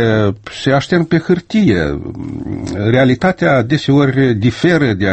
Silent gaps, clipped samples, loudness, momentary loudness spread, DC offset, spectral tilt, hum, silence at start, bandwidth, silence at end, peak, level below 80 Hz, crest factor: none; under 0.1%; -14 LUFS; 11 LU; under 0.1%; -7 dB/octave; none; 0 s; 8.6 kHz; 0 s; 0 dBFS; -38 dBFS; 14 dB